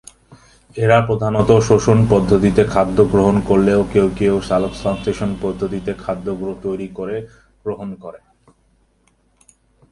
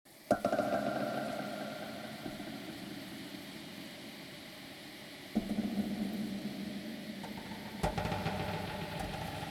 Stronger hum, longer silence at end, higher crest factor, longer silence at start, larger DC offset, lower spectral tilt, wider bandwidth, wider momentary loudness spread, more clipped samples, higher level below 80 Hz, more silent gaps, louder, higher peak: neither; first, 1.75 s vs 0 s; second, 18 dB vs 24 dB; first, 0.3 s vs 0.05 s; neither; first, -7 dB/octave vs -5.5 dB/octave; second, 11.5 kHz vs 19 kHz; about the same, 14 LU vs 13 LU; neither; first, -38 dBFS vs -56 dBFS; neither; first, -16 LUFS vs -39 LUFS; first, 0 dBFS vs -14 dBFS